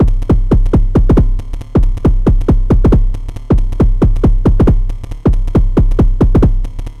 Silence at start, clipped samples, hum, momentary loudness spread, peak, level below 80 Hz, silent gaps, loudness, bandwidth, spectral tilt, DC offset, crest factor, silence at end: 0 s; under 0.1%; none; 7 LU; 0 dBFS; -12 dBFS; none; -13 LUFS; 3.9 kHz; -10 dB/octave; under 0.1%; 10 dB; 0 s